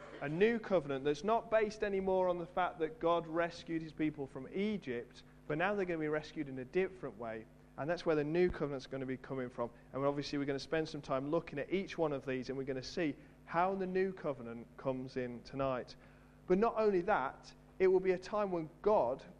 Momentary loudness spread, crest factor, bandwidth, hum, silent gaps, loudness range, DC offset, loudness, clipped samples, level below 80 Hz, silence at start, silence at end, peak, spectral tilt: 11 LU; 18 dB; 9.6 kHz; none; none; 4 LU; under 0.1%; -37 LUFS; under 0.1%; -62 dBFS; 0 s; 0 s; -18 dBFS; -6.5 dB/octave